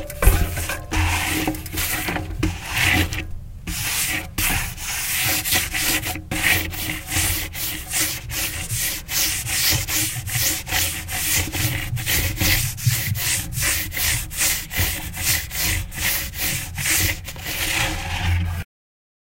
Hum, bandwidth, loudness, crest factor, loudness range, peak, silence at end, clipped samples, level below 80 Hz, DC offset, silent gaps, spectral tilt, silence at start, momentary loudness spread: none; 16 kHz; -21 LUFS; 22 dB; 2 LU; 0 dBFS; 0.7 s; under 0.1%; -30 dBFS; under 0.1%; none; -2 dB/octave; 0 s; 7 LU